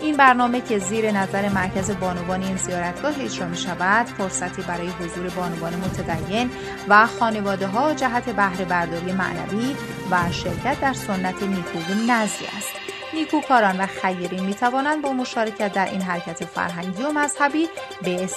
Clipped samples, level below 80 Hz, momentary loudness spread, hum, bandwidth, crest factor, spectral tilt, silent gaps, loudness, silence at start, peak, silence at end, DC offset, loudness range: under 0.1%; -50 dBFS; 9 LU; none; 13.5 kHz; 22 dB; -4.5 dB/octave; none; -22 LUFS; 0 s; 0 dBFS; 0 s; under 0.1%; 4 LU